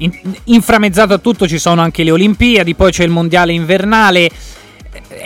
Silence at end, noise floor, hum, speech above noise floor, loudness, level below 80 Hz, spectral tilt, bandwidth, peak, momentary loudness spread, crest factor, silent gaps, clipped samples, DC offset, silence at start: 0 s; -33 dBFS; none; 23 dB; -10 LUFS; -30 dBFS; -5 dB/octave; 17 kHz; 0 dBFS; 5 LU; 10 dB; none; under 0.1%; under 0.1%; 0 s